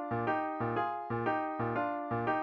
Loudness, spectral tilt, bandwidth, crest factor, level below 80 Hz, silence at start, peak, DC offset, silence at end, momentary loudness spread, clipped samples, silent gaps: -34 LUFS; -9 dB/octave; 6.2 kHz; 14 dB; -66 dBFS; 0 s; -20 dBFS; under 0.1%; 0 s; 2 LU; under 0.1%; none